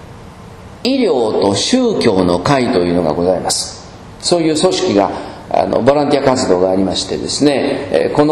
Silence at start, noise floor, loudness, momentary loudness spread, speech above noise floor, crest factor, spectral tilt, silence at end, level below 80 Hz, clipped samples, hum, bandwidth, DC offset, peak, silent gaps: 0 s; -34 dBFS; -14 LUFS; 6 LU; 21 dB; 14 dB; -4.5 dB/octave; 0 s; -42 dBFS; 0.1%; none; 13.5 kHz; under 0.1%; 0 dBFS; none